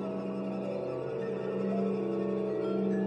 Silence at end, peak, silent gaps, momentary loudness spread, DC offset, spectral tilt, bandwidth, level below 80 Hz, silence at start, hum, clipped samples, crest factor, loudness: 0 s; -20 dBFS; none; 4 LU; under 0.1%; -9 dB/octave; 8.4 kHz; -76 dBFS; 0 s; none; under 0.1%; 12 dB; -33 LUFS